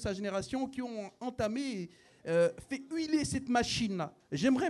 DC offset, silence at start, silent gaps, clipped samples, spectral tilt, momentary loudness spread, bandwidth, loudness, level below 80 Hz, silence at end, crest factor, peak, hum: under 0.1%; 0 s; none; under 0.1%; -5 dB/octave; 11 LU; 12.5 kHz; -34 LUFS; -58 dBFS; 0 s; 18 dB; -16 dBFS; none